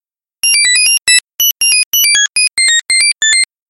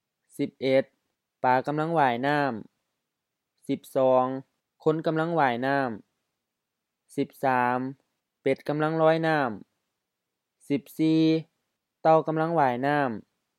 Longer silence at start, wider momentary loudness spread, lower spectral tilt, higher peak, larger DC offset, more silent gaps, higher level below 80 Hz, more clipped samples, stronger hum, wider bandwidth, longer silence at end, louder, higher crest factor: about the same, 0.45 s vs 0.4 s; second, 3 LU vs 11 LU; second, 5.5 dB/octave vs -7 dB/octave; first, 0 dBFS vs -8 dBFS; neither; first, 1.86-1.92 s vs none; first, -60 dBFS vs -80 dBFS; neither; neither; first, 17 kHz vs 14.5 kHz; second, 0.25 s vs 0.4 s; first, -8 LUFS vs -26 LUFS; second, 12 dB vs 20 dB